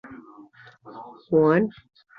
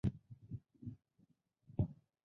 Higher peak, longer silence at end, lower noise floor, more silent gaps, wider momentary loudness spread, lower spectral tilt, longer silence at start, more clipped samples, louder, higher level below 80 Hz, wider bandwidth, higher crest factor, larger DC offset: first, -8 dBFS vs -24 dBFS; first, 0.5 s vs 0.3 s; second, -50 dBFS vs -75 dBFS; neither; first, 25 LU vs 15 LU; about the same, -10 dB/octave vs -11 dB/octave; about the same, 0.05 s vs 0.05 s; neither; first, -22 LUFS vs -46 LUFS; second, -64 dBFS vs -58 dBFS; second, 5 kHz vs 6 kHz; about the same, 18 dB vs 20 dB; neither